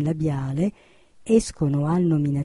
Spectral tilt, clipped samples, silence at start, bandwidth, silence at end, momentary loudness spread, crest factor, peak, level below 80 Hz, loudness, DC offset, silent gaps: -7.5 dB/octave; under 0.1%; 0 s; 11.5 kHz; 0 s; 6 LU; 16 dB; -6 dBFS; -46 dBFS; -23 LUFS; under 0.1%; none